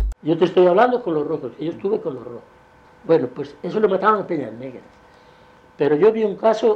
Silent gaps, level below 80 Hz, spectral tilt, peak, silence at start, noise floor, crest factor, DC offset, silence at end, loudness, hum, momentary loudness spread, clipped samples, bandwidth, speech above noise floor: none; -38 dBFS; -7.5 dB/octave; -4 dBFS; 0 s; -49 dBFS; 16 dB; under 0.1%; 0 s; -19 LUFS; none; 18 LU; under 0.1%; 8 kHz; 30 dB